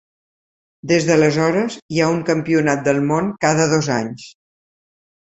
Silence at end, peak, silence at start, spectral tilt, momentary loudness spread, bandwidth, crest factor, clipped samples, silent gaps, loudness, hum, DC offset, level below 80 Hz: 0.9 s; -2 dBFS; 0.85 s; -5.5 dB/octave; 7 LU; 8.2 kHz; 18 dB; under 0.1%; 1.82-1.89 s; -17 LUFS; none; under 0.1%; -54 dBFS